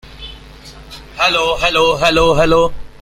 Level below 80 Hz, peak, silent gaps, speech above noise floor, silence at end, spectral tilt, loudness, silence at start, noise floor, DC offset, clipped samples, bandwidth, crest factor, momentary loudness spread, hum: -32 dBFS; 0 dBFS; none; 24 dB; 0.05 s; -4 dB/octave; -13 LUFS; 0.05 s; -36 dBFS; under 0.1%; under 0.1%; 15.5 kHz; 14 dB; 21 LU; none